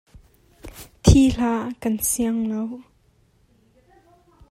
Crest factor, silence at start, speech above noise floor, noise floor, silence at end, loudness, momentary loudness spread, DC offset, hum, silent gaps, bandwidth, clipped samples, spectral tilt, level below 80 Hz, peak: 22 dB; 0.65 s; 39 dB; -60 dBFS; 1.7 s; -21 LUFS; 25 LU; under 0.1%; none; none; 16 kHz; under 0.1%; -5.5 dB/octave; -34 dBFS; 0 dBFS